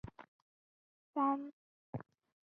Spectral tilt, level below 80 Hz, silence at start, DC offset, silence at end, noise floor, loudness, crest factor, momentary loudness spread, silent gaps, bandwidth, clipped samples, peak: -8 dB/octave; -70 dBFS; 0.05 s; under 0.1%; 0.4 s; under -90 dBFS; -39 LUFS; 20 dB; 19 LU; 0.28-1.13 s, 1.53-1.93 s; 4 kHz; under 0.1%; -22 dBFS